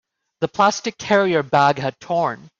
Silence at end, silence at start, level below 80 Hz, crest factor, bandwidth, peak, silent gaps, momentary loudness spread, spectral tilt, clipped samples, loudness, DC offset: 0.1 s; 0.4 s; -60 dBFS; 16 dB; 7.8 kHz; -4 dBFS; none; 10 LU; -4.5 dB/octave; under 0.1%; -19 LUFS; under 0.1%